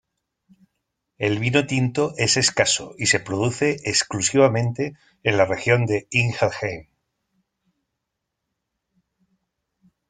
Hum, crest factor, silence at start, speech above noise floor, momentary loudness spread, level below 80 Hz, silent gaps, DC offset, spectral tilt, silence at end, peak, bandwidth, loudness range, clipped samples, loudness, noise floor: none; 22 dB; 1.2 s; 59 dB; 8 LU; -56 dBFS; none; under 0.1%; -4 dB/octave; 3.25 s; -2 dBFS; 9.6 kHz; 8 LU; under 0.1%; -21 LUFS; -81 dBFS